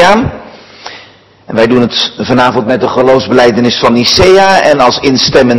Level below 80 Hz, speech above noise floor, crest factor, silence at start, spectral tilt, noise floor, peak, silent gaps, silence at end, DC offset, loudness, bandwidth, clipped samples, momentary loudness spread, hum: -34 dBFS; 31 dB; 8 dB; 0 s; -4.5 dB/octave; -38 dBFS; 0 dBFS; none; 0 s; under 0.1%; -7 LUFS; 12 kHz; 5%; 16 LU; none